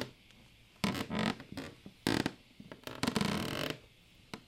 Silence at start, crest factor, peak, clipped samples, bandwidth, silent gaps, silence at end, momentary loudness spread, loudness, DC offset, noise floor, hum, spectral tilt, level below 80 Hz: 0 s; 26 dB; -14 dBFS; under 0.1%; 16.5 kHz; none; 0.05 s; 15 LU; -37 LUFS; under 0.1%; -61 dBFS; none; -4.5 dB/octave; -62 dBFS